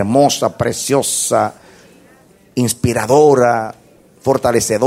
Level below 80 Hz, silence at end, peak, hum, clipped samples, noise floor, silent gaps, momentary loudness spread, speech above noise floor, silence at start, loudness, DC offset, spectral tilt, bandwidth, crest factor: -48 dBFS; 0 s; 0 dBFS; none; under 0.1%; -47 dBFS; none; 10 LU; 34 dB; 0 s; -15 LUFS; under 0.1%; -4.5 dB/octave; 16 kHz; 14 dB